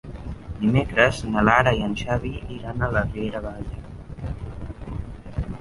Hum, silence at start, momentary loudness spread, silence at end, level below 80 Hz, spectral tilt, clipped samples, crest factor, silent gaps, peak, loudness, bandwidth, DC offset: none; 0.05 s; 18 LU; 0 s; -36 dBFS; -6.5 dB/octave; under 0.1%; 22 dB; none; -2 dBFS; -23 LUFS; 11.5 kHz; under 0.1%